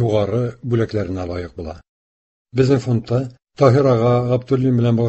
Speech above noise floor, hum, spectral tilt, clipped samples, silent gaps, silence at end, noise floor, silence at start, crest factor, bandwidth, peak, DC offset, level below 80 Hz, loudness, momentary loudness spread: over 73 dB; none; -8.5 dB/octave; under 0.1%; 1.89-2.45 s; 0 s; under -90 dBFS; 0 s; 16 dB; 8.2 kHz; -2 dBFS; under 0.1%; -42 dBFS; -18 LUFS; 13 LU